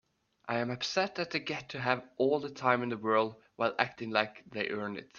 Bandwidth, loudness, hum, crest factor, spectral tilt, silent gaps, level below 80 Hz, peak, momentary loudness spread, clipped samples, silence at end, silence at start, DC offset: 7.2 kHz; -32 LUFS; none; 24 dB; -5 dB/octave; none; -74 dBFS; -8 dBFS; 7 LU; under 0.1%; 0 s; 0.45 s; under 0.1%